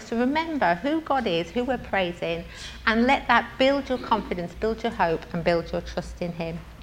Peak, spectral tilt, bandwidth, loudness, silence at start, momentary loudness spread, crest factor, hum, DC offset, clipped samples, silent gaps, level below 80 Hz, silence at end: -4 dBFS; -5.5 dB/octave; 16 kHz; -25 LUFS; 0 s; 11 LU; 22 dB; none; under 0.1%; under 0.1%; none; -44 dBFS; 0 s